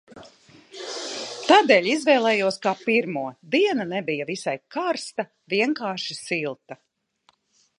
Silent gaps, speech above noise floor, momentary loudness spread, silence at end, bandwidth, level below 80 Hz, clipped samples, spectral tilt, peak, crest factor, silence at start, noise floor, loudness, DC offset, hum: none; 42 dB; 14 LU; 1.05 s; 11 kHz; -76 dBFS; under 0.1%; -4 dB/octave; -2 dBFS; 22 dB; 0.15 s; -65 dBFS; -23 LUFS; under 0.1%; none